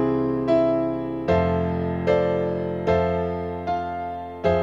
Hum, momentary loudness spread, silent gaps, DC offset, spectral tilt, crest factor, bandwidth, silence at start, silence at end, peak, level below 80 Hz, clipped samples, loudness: none; 7 LU; none; 0.2%; -9 dB/octave; 14 dB; 7.4 kHz; 0 s; 0 s; -8 dBFS; -44 dBFS; under 0.1%; -23 LUFS